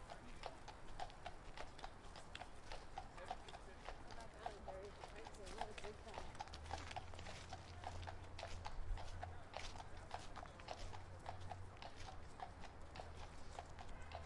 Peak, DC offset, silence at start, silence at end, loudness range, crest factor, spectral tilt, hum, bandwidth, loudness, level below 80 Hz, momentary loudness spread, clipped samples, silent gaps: -30 dBFS; under 0.1%; 0 s; 0 s; 3 LU; 22 dB; -4.5 dB/octave; none; 11.5 kHz; -54 LUFS; -58 dBFS; 5 LU; under 0.1%; none